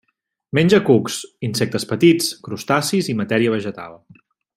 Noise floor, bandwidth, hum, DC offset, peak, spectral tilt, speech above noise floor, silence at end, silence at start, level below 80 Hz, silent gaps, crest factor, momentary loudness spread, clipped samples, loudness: -72 dBFS; 16 kHz; none; under 0.1%; -2 dBFS; -5 dB/octave; 54 dB; 0.6 s; 0.55 s; -58 dBFS; none; 18 dB; 13 LU; under 0.1%; -18 LUFS